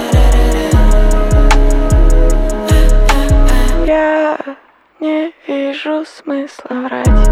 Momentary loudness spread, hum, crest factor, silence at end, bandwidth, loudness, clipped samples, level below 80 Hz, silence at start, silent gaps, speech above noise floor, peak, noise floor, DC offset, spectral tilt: 10 LU; none; 10 dB; 0 s; 13.5 kHz; -14 LUFS; under 0.1%; -10 dBFS; 0 s; none; 24 dB; 0 dBFS; -38 dBFS; under 0.1%; -6 dB/octave